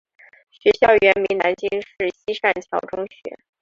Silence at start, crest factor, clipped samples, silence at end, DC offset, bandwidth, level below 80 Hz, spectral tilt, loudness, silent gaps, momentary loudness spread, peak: 0.65 s; 18 dB; under 0.1%; 0.25 s; under 0.1%; 7.4 kHz; -56 dBFS; -5 dB/octave; -19 LUFS; none; 16 LU; -2 dBFS